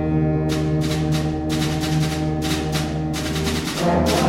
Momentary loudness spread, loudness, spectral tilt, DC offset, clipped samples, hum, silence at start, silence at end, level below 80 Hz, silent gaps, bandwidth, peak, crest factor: 3 LU; -21 LUFS; -5.5 dB/octave; under 0.1%; under 0.1%; none; 0 s; 0 s; -36 dBFS; none; 16.5 kHz; -6 dBFS; 14 dB